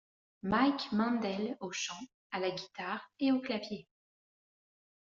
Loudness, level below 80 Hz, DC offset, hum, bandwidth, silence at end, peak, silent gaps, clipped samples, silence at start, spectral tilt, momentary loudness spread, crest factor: -35 LUFS; -68 dBFS; under 0.1%; none; 7.4 kHz; 1.25 s; -14 dBFS; 2.14-2.30 s; under 0.1%; 0.45 s; -3.5 dB/octave; 13 LU; 22 dB